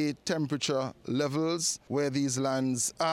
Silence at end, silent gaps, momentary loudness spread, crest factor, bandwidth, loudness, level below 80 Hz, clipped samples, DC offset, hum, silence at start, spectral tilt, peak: 0 s; none; 3 LU; 14 dB; 16 kHz; -30 LUFS; -68 dBFS; under 0.1%; under 0.1%; none; 0 s; -4 dB/octave; -16 dBFS